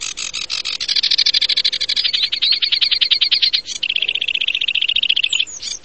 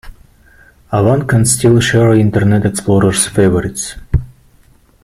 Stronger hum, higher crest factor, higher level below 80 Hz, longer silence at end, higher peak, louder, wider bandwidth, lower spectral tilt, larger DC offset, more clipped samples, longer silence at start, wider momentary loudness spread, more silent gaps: neither; about the same, 18 dB vs 14 dB; second, -54 dBFS vs -32 dBFS; second, 0.05 s vs 0.75 s; about the same, 0 dBFS vs 0 dBFS; second, -15 LUFS vs -12 LUFS; second, 8.8 kHz vs 15 kHz; second, 2.5 dB/octave vs -5.5 dB/octave; first, 0.6% vs under 0.1%; neither; about the same, 0 s vs 0.05 s; about the same, 8 LU vs 10 LU; neither